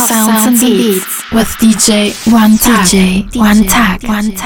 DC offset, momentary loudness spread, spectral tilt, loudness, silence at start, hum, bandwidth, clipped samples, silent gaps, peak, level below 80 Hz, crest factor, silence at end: under 0.1%; 6 LU; -3.5 dB/octave; -9 LUFS; 0 s; none; over 20 kHz; under 0.1%; none; 0 dBFS; -28 dBFS; 8 dB; 0 s